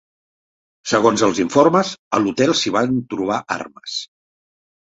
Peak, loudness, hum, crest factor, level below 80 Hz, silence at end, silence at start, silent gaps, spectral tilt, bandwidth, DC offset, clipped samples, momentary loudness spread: 0 dBFS; -18 LUFS; none; 18 dB; -58 dBFS; 0.8 s; 0.85 s; 1.99-2.11 s; -4.5 dB/octave; 8.2 kHz; under 0.1%; under 0.1%; 13 LU